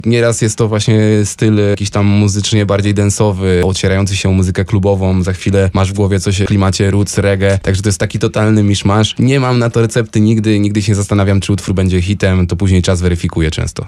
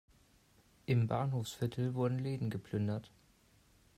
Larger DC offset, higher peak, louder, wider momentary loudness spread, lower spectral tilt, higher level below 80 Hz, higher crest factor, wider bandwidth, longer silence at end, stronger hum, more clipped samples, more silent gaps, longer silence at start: neither; first, -2 dBFS vs -20 dBFS; first, -12 LUFS vs -37 LUFS; second, 3 LU vs 6 LU; second, -6 dB/octave vs -7.5 dB/octave; first, -32 dBFS vs -68 dBFS; second, 10 dB vs 18 dB; second, 12 kHz vs 15 kHz; second, 0 s vs 0.9 s; neither; neither; neither; second, 0.05 s vs 0.9 s